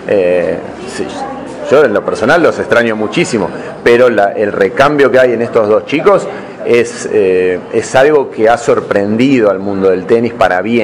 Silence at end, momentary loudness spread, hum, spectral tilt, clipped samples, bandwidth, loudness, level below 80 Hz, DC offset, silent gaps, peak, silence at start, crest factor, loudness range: 0 s; 11 LU; none; -5.5 dB/octave; 2%; 11 kHz; -11 LUFS; -46 dBFS; under 0.1%; none; 0 dBFS; 0 s; 10 dB; 2 LU